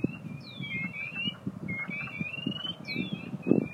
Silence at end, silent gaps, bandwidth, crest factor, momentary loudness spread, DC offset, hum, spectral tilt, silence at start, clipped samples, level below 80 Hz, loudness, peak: 0 s; none; 13.5 kHz; 28 dB; 7 LU; under 0.1%; none; -7 dB/octave; 0 s; under 0.1%; -64 dBFS; -34 LUFS; -6 dBFS